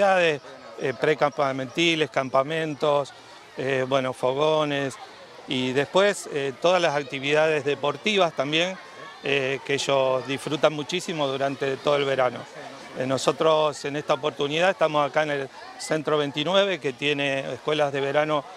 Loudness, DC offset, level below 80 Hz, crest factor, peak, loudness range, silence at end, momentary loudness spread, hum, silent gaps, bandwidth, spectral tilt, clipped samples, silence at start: -24 LUFS; under 0.1%; -70 dBFS; 20 dB; -4 dBFS; 2 LU; 0 s; 10 LU; none; none; 13 kHz; -4 dB/octave; under 0.1%; 0 s